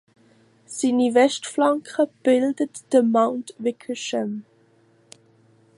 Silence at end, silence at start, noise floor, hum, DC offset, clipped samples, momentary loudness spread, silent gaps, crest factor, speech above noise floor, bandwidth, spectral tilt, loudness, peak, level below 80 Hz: 1.35 s; 0.7 s; -58 dBFS; none; under 0.1%; under 0.1%; 11 LU; none; 18 dB; 37 dB; 11.5 kHz; -4 dB/octave; -22 LUFS; -4 dBFS; -78 dBFS